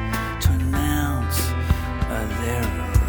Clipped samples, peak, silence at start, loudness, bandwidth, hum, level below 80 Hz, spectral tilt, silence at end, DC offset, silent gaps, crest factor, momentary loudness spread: under 0.1%; -4 dBFS; 0 s; -23 LUFS; over 20 kHz; none; -26 dBFS; -5.5 dB/octave; 0 s; under 0.1%; none; 16 dB; 4 LU